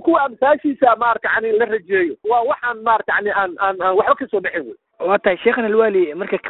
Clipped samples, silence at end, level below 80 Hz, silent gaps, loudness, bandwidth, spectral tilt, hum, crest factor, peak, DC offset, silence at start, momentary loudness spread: under 0.1%; 0 s; -58 dBFS; none; -17 LUFS; 4.1 kHz; -10 dB/octave; none; 16 dB; 0 dBFS; under 0.1%; 0 s; 5 LU